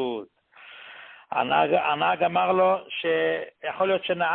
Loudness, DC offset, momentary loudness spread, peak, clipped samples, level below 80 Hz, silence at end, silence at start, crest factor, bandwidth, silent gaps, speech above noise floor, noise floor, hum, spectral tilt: -24 LUFS; under 0.1%; 21 LU; -8 dBFS; under 0.1%; -68 dBFS; 0 s; 0 s; 16 dB; 4.3 kHz; none; 24 dB; -48 dBFS; none; -9 dB/octave